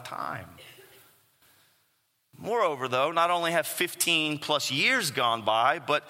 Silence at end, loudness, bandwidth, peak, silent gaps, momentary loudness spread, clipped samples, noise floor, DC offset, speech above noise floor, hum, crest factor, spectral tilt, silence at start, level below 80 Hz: 0 s; -26 LUFS; 16.5 kHz; -10 dBFS; none; 12 LU; under 0.1%; -72 dBFS; under 0.1%; 45 dB; none; 20 dB; -2.5 dB/octave; 0 s; -76 dBFS